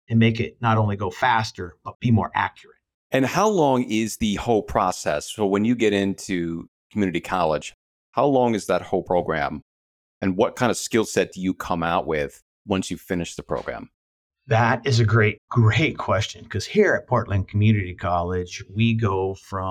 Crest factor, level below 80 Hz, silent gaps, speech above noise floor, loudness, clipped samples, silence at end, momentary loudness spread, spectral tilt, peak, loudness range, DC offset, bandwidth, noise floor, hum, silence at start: 18 dB; -48 dBFS; 1.95-2.00 s, 2.94-3.10 s, 6.68-6.90 s, 7.74-8.13 s, 9.62-10.21 s, 12.42-12.65 s, 13.94-14.30 s, 15.38-15.48 s; over 68 dB; -22 LUFS; under 0.1%; 0 s; 10 LU; -6 dB/octave; -4 dBFS; 4 LU; under 0.1%; 14 kHz; under -90 dBFS; none; 0.1 s